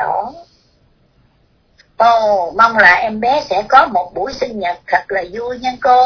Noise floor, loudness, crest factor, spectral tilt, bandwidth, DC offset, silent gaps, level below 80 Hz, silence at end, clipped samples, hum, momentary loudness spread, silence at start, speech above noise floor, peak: -55 dBFS; -13 LUFS; 14 dB; -4 dB/octave; 5.4 kHz; under 0.1%; none; -48 dBFS; 0 s; 0.2%; none; 13 LU; 0 s; 42 dB; 0 dBFS